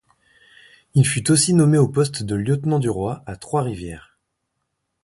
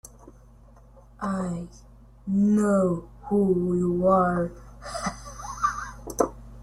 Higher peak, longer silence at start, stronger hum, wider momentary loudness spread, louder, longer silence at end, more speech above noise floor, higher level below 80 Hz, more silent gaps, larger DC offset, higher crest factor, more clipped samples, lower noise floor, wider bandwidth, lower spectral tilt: about the same, -2 dBFS vs -4 dBFS; first, 0.95 s vs 0.25 s; neither; about the same, 16 LU vs 16 LU; first, -19 LUFS vs -25 LUFS; first, 1.05 s vs 0 s; first, 57 dB vs 28 dB; about the same, -48 dBFS vs -48 dBFS; neither; neither; about the same, 18 dB vs 22 dB; neither; first, -76 dBFS vs -51 dBFS; second, 11.5 kHz vs 13.5 kHz; second, -5.5 dB/octave vs -7 dB/octave